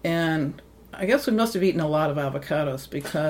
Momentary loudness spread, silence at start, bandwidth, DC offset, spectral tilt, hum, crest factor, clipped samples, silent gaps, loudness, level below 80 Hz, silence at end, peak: 10 LU; 0.05 s; 16.5 kHz; under 0.1%; -6 dB/octave; none; 18 dB; under 0.1%; none; -25 LUFS; -54 dBFS; 0 s; -6 dBFS